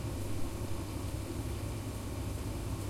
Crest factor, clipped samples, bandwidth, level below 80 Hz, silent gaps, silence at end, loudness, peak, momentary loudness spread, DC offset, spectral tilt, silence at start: 14 dB; under 0.1%; 16.5 kHz; -44 dBFS; none; 0 s; -39 LUFS; -24 dBFS; 1 LU; under 0.1%; -6 dB/octave; 0 s